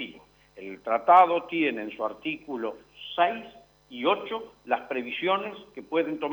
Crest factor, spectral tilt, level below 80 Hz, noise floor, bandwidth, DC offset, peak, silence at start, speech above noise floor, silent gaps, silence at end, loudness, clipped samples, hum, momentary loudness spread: 20 dB; -6 dB/octave; -70 dBFS; -52 dBFS; 19.5 kHz; under 0.1%; -6 dBFS; 0 s; 25 dB; none; 0 s; -26 LUFS; under 0.1%; none; 20 LU